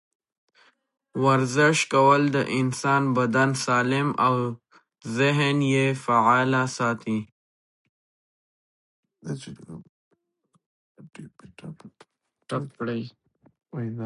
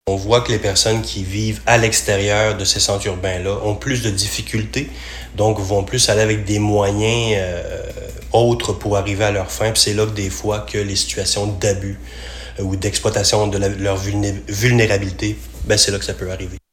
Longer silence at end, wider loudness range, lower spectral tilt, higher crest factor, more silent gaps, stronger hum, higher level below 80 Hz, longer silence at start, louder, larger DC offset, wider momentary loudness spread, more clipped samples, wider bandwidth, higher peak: second, 0 s vs 0.15 s; first, 22 LU vs 3 LU; first, -5.5 dB/octave vs -4 dB/octave; about the same, 20 dB vs 18 dB; first, 7.32-9.03 s, 9.89-10.11 s, 10.66-10.95 s vs none; neither; second, -68 dBFS vs -34 dBFS; first, 1.15 s vs 0.05 s; second, -23 LUFS vs -17 LUFS; neither; first, 22 LU vs 12 LU; neither; second, 11.5 kHz vs 18 kHz; second, -6 dBFS vs 0 dBFS